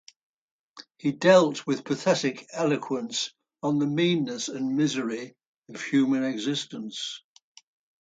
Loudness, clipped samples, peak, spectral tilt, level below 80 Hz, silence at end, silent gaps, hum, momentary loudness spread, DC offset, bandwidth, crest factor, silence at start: -26 LUFS; under 0.1%; -8 dBFS; -5 dB/octave; -74 dBFS; 0.85 s; 5.46-5.62 s; none; 14 LU; under 0.1%; 9.2 kHz; 20 dB; 0.75 s